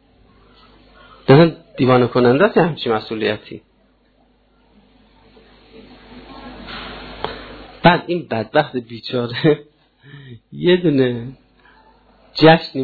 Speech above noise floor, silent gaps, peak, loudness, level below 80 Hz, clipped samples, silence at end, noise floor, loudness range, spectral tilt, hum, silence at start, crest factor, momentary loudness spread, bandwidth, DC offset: 42 dB; none; 0 dBFS; -16 LUFS; -48 dBFS; under 0.1%; 0 s; -57 dBFS; 19 LU; -9 dB/octave; none; 1.3 s; 18 dB; 24 LU; 4.8 kHz; under 0.1%